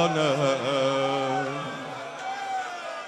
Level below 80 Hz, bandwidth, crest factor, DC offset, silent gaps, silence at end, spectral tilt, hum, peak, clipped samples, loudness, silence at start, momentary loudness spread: -70 dBFS; 12.5 kHz; 18 dB; under 0.1%; none; 0 s; -4.5 dB/octave; none; -8 dBFS; under 0.1%; -27 LUFS; 0 s; 11 LU